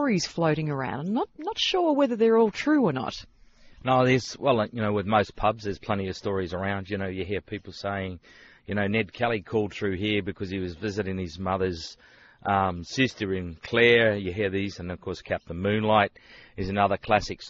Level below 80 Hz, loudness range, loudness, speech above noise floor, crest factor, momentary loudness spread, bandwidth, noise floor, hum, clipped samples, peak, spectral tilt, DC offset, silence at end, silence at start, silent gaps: -52 dBFS; 6 LU; -26 LUFS; 25 dB; 20 dB; 12 LU; 7.6 kHz; -51 dBFS; none; under 0.1%; -6 dBFS; -4 dB/octave; under 0.1%; 0 s; 0 s; none